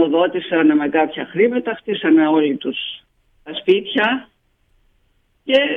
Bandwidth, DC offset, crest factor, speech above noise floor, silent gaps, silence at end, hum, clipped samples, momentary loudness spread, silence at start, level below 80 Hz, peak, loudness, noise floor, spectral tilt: 4.2 kHz; under 0.1%; 14 dB; 45 dB; none; 0 s; none; under 0.1%; 11 LU; 0 s; -62 dBFS; -4 dBFS; -18 LUFS; -61 dBFS; -7 dB/octave